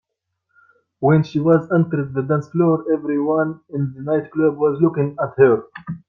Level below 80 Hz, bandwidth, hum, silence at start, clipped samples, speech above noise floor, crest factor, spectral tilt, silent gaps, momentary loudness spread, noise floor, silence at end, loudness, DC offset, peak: -60 dBFS; 6.2 kHz; none; 1 s; under 0.1%; 57 dB; 16 dB; -10 dB/octave; none; 7 LU; -75 dBFS; 0.1 s; -19 LUFS; under 0.1%; -2 dBFS